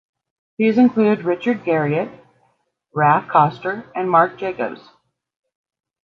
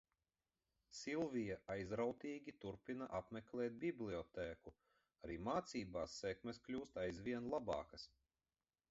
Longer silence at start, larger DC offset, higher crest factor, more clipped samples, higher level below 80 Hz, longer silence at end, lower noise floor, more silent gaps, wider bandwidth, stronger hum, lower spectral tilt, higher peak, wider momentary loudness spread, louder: second, 0.6 s vs 0.9 s; neither; about the same, 18 dB vs 20 dB; neither; about the same, -66 dBFS vs -70 dBFS; first, 1.25 s vs 0.85 s; second, -65 dBFS vs under -90 dBFS; neither; second, 6 kHz vs 7.6 kHz; neither; first, -9 dB/octave vs -5 dB/octave; first, -2 dBFS vs -28 dBFS; first, 12 LU vs 9 LU; first, -18 LUFS vs -47 LUFS